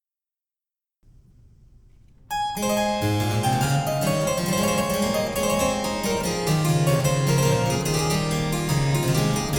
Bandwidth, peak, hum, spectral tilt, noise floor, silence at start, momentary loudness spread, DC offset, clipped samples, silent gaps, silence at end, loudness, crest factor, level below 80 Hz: 19.5 kHz; -8 dBFS; none; -5 dB/octave; under -90 dBFS; 2.3 s; 4 LU; under 0.1%; under 0.1%; none; 0 s; -23 LUFS; 14 dB; -42 dBFS